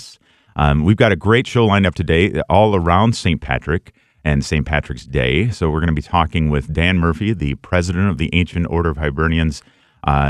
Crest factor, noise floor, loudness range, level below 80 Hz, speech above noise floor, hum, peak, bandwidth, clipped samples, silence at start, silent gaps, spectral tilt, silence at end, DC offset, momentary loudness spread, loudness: 16 dB; -46 dBFS; 4 LU; -28 dBFS; 30 dB; none; 0 dBFS; 11 kHz; under 0.1%; 0 s; none; -6.5 dB/octave; 0 s; under 0.1%; 7 LU; -17 LUFS